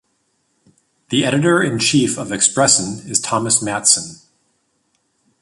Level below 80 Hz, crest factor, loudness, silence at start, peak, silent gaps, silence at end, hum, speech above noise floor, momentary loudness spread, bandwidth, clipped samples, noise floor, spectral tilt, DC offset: -56 dBFS; 18 dB; -15 LUFS; 1.1 s; 0 dBFS; none; 1.25 s; none; 49 dB; 6 LU; 11.5 kHz; under 0.1%; -66 dBFS; -3 dB/octave; under 0.1%